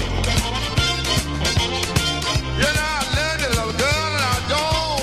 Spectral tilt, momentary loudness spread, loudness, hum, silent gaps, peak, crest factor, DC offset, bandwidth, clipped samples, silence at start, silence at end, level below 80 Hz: -3.5 dB/octave; 2 LU; -20 LUFS; none; none; -4 dBFS; 16 dB; under 0.1%; 15 kHz; under 0.1%; 0 s; 0 s; -30 dBFS